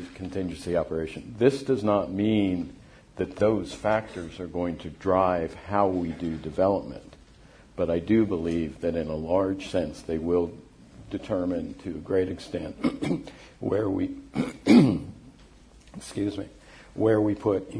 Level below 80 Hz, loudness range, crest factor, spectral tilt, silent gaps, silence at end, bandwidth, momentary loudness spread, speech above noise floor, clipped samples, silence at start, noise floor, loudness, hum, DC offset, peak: -50 dBFS; 4 LU; 22 dB; -7 dB/octave; none; 0 s; 10.5 kHz; 14 LU; 26 dB; under 0.1%; 0 s; -53 dBFS; -27 LUFS; none; under 0.1%; -6 dBFS